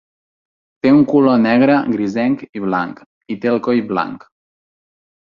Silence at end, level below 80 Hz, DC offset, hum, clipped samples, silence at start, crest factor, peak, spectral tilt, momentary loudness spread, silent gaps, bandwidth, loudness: 1.05 s; -58 dBFS; under 0.1%; none; under 0.1%; 0.85 s; 16 dB; -2 dBFS; -8 dB/octave; 12 LU; 2.49-2.53 s, 3.06-3.21 s; 7 kHz; -15 LUFS